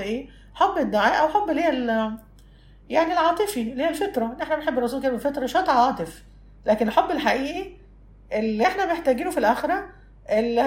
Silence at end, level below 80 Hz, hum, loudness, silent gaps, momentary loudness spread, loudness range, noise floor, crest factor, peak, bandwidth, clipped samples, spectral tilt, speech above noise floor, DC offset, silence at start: 0 s; -50 dBFS; none; -23 LUFS; none; 10 LU; 2 LU; -49 dBFS; 18 dB; -6 dBFS; 16 kHz; under 0.1%; -4.5 dB/octave; 27 dB; under 0.1%; 0 s